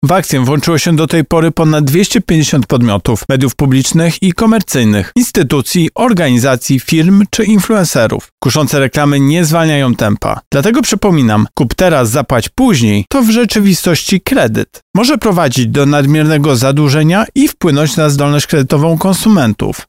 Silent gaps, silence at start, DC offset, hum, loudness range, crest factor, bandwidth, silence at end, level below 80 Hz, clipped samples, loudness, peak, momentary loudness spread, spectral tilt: 8.32-8.38 s, 10.46-10.51 s, 14.82-14.94 s; 0 s; 0.5%; none; 1 LU; 10 dB; 16.5 kHz; 0.05 s; -34 dBFS; under 0.1%; -10 LUFS; 0 dBFS; 3 LU; -5.5 dB/octave